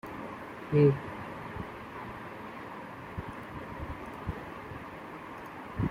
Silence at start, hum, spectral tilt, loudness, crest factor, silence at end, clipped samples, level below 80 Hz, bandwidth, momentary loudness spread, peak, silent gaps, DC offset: 0.05 s; none; -8.5 dB/octave; -35 LUFS; 22 dB; 0 s; under 0.1%; -54 dBFS; 15 kHz; 17 LU; -12 dBFS; none; under 0.1%